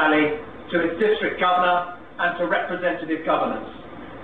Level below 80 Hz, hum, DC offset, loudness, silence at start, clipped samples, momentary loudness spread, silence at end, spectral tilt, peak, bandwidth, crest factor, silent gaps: -54 dBFS; none; 0.5%; -22 LUFS; 0 s; under 0.1%; 14 LU; 0 s; -7 dB/octave; -8 dBFS; 4.6 kHz; 16 dB; none